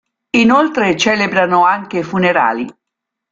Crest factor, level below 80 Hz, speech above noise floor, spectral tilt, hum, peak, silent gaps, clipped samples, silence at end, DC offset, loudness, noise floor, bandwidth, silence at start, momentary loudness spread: 14 dB; -54 dBFS; 66 dB; -4.5 dB/octave; none; 0 dBFS; none; under 0.1%; 0.6 s; under 0.1%; -13 LUFS; -79 dBFS; 7.8 kHz; 0.35 s; 8 LU